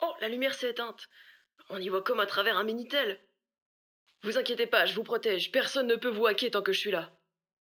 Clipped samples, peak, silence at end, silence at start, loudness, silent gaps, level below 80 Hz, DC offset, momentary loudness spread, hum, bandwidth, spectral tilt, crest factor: under 0.1%; -10 dBFS; 0.55 s; 0 s; -30 LUFS; 3.62-4.06 s; under -90 dBFS; under 0.1%; 12 LU; none; 19.5 kHz; -3 dB/octave; 22 dB